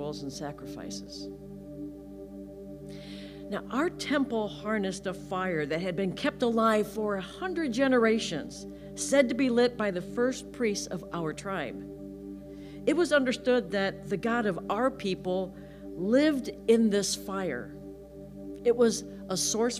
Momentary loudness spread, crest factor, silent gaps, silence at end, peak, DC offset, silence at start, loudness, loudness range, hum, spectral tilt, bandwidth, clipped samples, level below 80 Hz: 18 LU; 20 dB; none; 0 s; -10 dBFS; under 0.1%; 0 s; -29 LUFS; 7 LU; none; -4.5 dB/octave; 15.5 kHz; under 0.1%; -56 dBFS